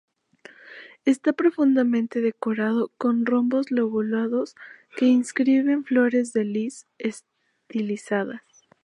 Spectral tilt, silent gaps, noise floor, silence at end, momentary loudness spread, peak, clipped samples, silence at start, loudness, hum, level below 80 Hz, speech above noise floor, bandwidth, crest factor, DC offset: -6 dB/octave; none; -51 dBFS; 0.45 s; 13 LU; -8 dBFS; under 0.1%; 0.65 s; -23 LUFS; none; -78 dBFS; 28 dB; 11 kHz; 14 dB; under 0.1%